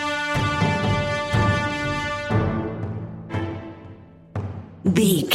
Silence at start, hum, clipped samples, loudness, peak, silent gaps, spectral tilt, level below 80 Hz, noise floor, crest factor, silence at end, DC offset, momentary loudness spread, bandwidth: 0 s; none; under 0.1%; -23 LUFS; -4 dBFS; none; -5.5 dB/octave; -42 dBFS; -43 dBFS; 20 dB; 0 s; under 0.1%; 14 LU; 16 kHz